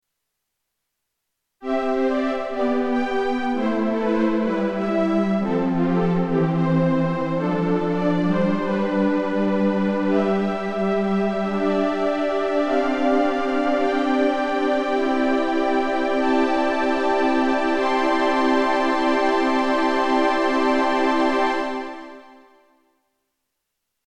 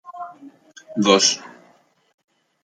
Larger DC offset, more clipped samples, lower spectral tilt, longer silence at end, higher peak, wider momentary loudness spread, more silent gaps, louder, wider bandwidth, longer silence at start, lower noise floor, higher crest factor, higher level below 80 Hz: neither; neither; first, -7 dB/octave vs -2.5 dB/octave; first, 1.85 s vs 1.15 s; second, -6 dBFS vs -2 dBFS; second, 3 LU vs 22 LU; neither; second, -21 LUFS vs -18 LUFS; about the same, 10 kHz vs 11 kHz; first, 1.6 s vs 0.05 s; first, -79 dBFS vs -57 dBFS; second, 14 dB vs 22 dB; first, -52 dBFS vs -72 dBFS